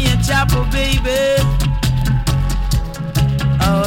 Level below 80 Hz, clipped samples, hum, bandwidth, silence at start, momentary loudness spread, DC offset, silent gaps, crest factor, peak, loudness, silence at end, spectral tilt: -20 dBFS; under 0.1%; none; 17 kHz; 0 s; 5 LU; under 0.1%; none; 12 dB; -2 dBFS; -16 LUFS; 0 s; -5.5 dB/octave